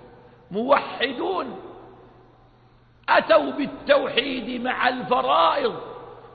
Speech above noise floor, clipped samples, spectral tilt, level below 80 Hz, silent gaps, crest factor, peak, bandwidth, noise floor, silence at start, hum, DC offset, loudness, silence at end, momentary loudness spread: 33 dB; under 0.1%; -8.5 dB/octave; -58 dBFS; none; 18 dB; -6 dBFS; 4.9 kHz; -55 dBFS; 0 s; none; under 0.1%; -22 LUFS; 0.05 s; 17 LU